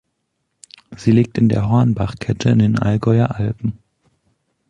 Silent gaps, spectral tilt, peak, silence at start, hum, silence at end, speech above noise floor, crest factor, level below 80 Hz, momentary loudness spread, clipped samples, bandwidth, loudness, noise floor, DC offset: none; -8 dB/octave; -2 dBFS; 0.9 s; none; 1 s; 56 dB; 16 dB; -42 dBFS; 7 LU; under 0.1%; 9.2 kHz; -17 LUFS; -72 dBFS; under 0.1%